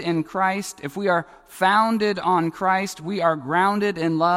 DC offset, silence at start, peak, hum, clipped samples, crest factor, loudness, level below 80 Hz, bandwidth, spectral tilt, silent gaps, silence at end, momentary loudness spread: under 0.1%; 0 s; -6 dBFS; none; under 0.1%; 16 dB; -22 LUFS; -62 dBFS; 16 kHz; -5 dB/octave; none; 0 s; 8 LU